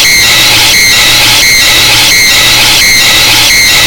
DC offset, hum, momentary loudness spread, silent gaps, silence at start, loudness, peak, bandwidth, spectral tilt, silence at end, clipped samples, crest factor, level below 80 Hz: under 0.1%; none; 0 LU; none; 0 s; -1 LUFS; 0 dBFS; over 20 kHz; 0 dB/octave; 0 s; 7%; 4 dB; -26 dBFS